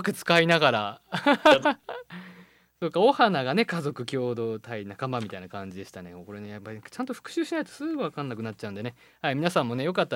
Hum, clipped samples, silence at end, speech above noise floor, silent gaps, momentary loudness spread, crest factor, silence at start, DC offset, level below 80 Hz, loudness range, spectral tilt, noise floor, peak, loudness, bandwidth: none; under 0.1%; 0 s; 28 dB; none; 20 LU; 22 dB; 0 s; under 0.1%; -70 dBFS; 11 LU; -5.5 dB/octave; -54 dBFS; -4 dBFS; -26 LUFS; 17 kHz